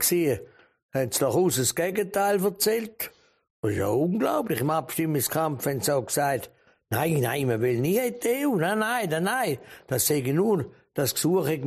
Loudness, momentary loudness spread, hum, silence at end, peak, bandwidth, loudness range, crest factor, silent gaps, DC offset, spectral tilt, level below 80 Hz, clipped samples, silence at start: -26 LUFS; 8 LU; none; 0 s; -12 dBFS; 15.5 kHz; 1 LU; 14 dB; 0.82-0.89 s, 3.50-3.63 s; under 0.1%; -4.5 dB/octave; -62 dBFS; under 0.1%; 0 s